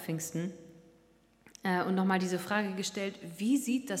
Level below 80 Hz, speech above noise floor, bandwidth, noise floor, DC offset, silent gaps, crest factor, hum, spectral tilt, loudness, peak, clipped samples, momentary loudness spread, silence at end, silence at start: -76 dBFS; 33 dB; 16 kHz; -65 dBFS; under 0.1%; none; 20 dB; none; -5 dB/octave; -33 LUFS; -14 dBFS; under 0.1%; 9 LU; 0 s; 0 s